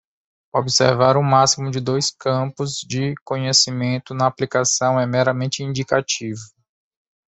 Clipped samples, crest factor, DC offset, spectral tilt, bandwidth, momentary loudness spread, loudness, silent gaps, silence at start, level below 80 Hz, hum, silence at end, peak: under 0.1%; 18 dB; under 0.1%; -4 dB/octave; 8.4 kHz; 9 LU; -19 LUFS; 3.21-3.26 s; 0.55 s; -58 dBFS; none; 0.95 s; -2 dBFS